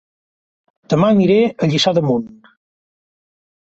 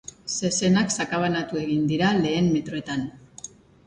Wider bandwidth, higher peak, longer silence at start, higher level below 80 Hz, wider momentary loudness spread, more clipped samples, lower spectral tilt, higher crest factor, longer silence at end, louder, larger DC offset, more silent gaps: second, 8.2 kHz vs 10.5 kHz; first, -2 dBFS vs -8 dBFS; first, 0.9 s vs 0.25 s; about the same, -56 dBFS vs -54 dBFS; second, 8 LU vs 18 LU; neither; first, -6.5 dB/octave vs -4.5 dB/octave; about the same, 16 dB vs 16 dB; first, 1.5 s vs 0.4 s; first, -15 LUFS vs -24 LUFS; neither; neither